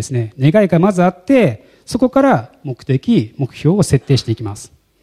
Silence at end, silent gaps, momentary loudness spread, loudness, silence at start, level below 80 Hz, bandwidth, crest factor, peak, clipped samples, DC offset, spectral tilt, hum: 0.35 s; none; 14 LU; -15 LUFS; 0 s; -44 dBFS; 13.5 kHz; 14 dB; 0 dBFS; under 0.1%; under 0.1%; -7 dB/octave; none